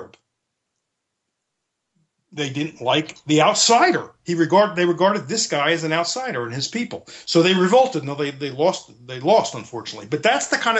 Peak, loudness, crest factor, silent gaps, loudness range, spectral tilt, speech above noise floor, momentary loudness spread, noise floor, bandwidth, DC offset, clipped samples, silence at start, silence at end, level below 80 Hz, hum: -4 dBFS; -19 LUFS; 18 dB; none; 4 LU; -3.5 dB/octave; 59 dB; 13 LU; -78 dBFS; 8.6 kHz; under 0.1%; under 0.1%; 0 s; 0 s; -70 dBFS; none